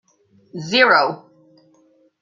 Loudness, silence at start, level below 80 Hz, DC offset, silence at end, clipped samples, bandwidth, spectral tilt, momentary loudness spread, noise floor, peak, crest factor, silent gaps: -15 LUFS; 0.55 s; -72 dBFS; under 0.1%; 1.05 s; under 0.1%; 7.6 kHz; -4 dB/octave; 23 LU; -57 dBFS; -2 dBFS; 20 dB; none